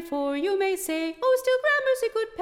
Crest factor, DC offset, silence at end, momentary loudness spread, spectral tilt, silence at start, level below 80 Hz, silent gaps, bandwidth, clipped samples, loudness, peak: 12 dB; under 0.1%; 0 s; 6 LU; -1.5 dB/octave; 0 s; -62 dBFS; none; 17 kHz; under 0.1%; -25 LUFS; -14 dBFS